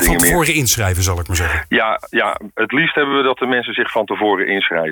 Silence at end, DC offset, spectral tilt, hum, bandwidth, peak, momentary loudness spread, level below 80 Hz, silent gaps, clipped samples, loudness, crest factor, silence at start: 0 s; under 0.1%; -3.5 dB/octave; none; 19.5 kHz; 0 dBFS; 6 LU; -30 dBFS; none; under 0.1%; -16 LUFS; 16 dB; 0 s